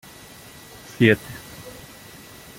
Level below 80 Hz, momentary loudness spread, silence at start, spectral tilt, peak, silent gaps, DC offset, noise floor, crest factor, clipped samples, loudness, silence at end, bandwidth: -56 dBFS; 24 LU; 1 s; -6 dB/octave; -2 dBFS; none; under 0.1%; -44 dBFS; 24 dB; under 0.1%; -19 LUFS; 0.9 s; 17 kHz